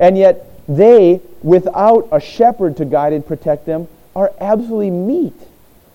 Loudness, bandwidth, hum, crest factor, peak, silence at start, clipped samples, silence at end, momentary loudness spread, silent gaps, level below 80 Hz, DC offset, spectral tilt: -13 LUFS; 16.5 kHz; none; 12 dB; 0 dBFS; 0 s; under 0.1%; 0.5 s; 12 LU; none; -48 dBFS; under 0.1%; -8.5 dB/octave